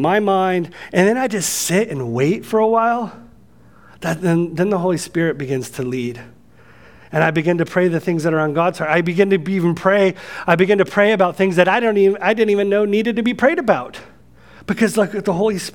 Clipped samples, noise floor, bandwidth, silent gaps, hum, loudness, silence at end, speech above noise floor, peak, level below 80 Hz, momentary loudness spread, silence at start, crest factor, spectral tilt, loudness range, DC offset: under 0.1%; -48 dBFS; 18 kHz; none; none; -17 LUFS; 0.05 s; 31 dB; 0 dBFS; -56 dBFS; 9 LU; 0 s; 18 dB; -5.5 dB/octave; 6 LU; 0.3%